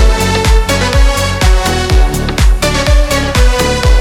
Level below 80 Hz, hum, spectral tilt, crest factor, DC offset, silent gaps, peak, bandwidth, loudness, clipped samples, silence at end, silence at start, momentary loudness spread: -10 dBFS; none; -4.5 dB/octave; 8 dB; under 0.1%; none; 0 dBFS; 16 kHz; -11 LUFS; under 0.1%; 0 s; 0 s; 2 LU